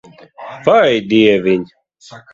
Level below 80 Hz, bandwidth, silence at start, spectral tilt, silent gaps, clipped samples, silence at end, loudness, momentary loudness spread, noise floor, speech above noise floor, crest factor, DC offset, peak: -54 dBFS; 7.6 kHz; 0.4 s; -6 dB/octave; none; under 0.1%; 0.15 s; -13 LUFS; 22 LU; -34 dBFS; 21 dB; 14 dB; under 0.1%; 0 dBFS